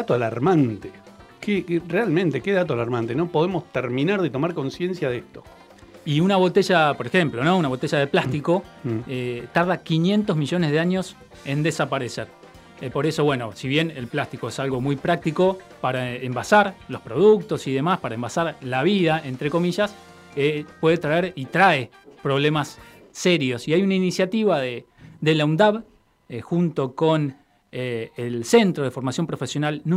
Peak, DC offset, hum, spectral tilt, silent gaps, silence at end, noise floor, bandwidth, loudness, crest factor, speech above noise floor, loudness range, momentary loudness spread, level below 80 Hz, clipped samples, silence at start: -4 dBFS; under 0.1%; none; -6 dB/octave; none; 0 s; -47 dBFS; 14.5 kHz; -22 LUFS; 18 dB; 25 dB; 3 LU; 11 LU; -58 dBFS; under 0.1%; 0 s